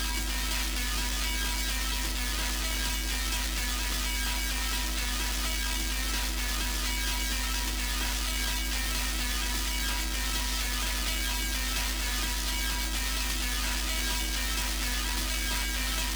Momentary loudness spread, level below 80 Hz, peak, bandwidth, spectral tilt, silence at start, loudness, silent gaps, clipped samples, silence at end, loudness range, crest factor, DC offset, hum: 1 LU; -34 dBFS; -16 dBFS; over 20 kHz; -2 dB/octave; 0 s; -29 LUFS; none; under 0.1%; 0 s; 0 LU; 14 dB; under 0.1%; none